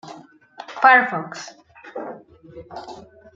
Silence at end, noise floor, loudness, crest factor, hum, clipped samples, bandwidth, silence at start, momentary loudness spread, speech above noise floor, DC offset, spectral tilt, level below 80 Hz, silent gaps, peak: 0.35 s; -44 dBFS; -16 LUFS; 22 dB; none; under 0.1%; 7.6 kHz; 0.05 s; 26 LU; 24 dB; under 0.1%; -3.5 dB/octave; -66 dBFS; none; -2 dBFS